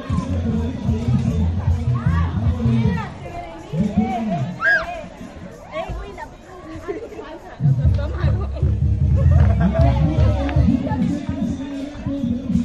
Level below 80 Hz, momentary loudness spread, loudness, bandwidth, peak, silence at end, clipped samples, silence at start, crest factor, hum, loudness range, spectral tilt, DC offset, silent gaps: -26 dBFS; 17 LU; -20 LUFS; 7.8 kHz; -4 dBFS; 0 s; under 0.1%; 0 s; 16 dB; none; 7 LU; -8.5 dB/octave; under 0.1%; none